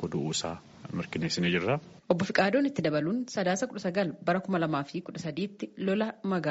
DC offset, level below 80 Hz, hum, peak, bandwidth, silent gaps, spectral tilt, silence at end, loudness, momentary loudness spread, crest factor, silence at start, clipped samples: under 0.1%; -64 dBFS; none; -10 dBFS; 8 kHz; none; -4.5 dB/octave; 0 s; -30 LUFS; 10 LU; 20 dB; 0 s; under 0.1%